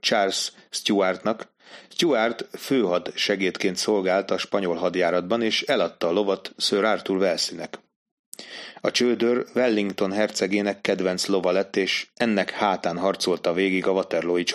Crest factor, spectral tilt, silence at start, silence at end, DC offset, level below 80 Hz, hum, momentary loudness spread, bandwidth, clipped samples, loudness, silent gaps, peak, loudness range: 18 dB; -3.5 dB/octave; 0.05 s; 0 s; under 0.1%; -70 dBFS; none; 7 LU; 15 kHz; under 0.1%; -23 LUFS; 7.96-8.32 s; -6 dBFS; 2 LU